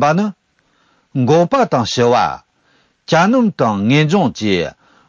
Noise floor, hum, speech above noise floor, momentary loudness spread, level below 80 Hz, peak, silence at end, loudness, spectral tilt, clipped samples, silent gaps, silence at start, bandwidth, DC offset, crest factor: -59 dBFS; none; 45 dB; 9 LU; -50 dBFS; -2 dBFS; 0.4 s; -15 LUFS; -6 dB/octave; under 0.1%; none; 0 s; 7.6 kHz; under 0.1%; 14 dB